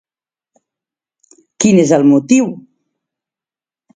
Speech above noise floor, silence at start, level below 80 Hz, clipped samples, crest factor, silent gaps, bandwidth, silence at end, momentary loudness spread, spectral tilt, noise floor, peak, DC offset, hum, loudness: over 80 dB; 1.6 s; -58 dBFS; under 0.1%; 16 dB; none; 9.4 kHz; 1.4 s; 11 LU; -5.5 dB/octave; under -90 dBFS; 0 dBFS; under 0.1%; none; -12 LUFS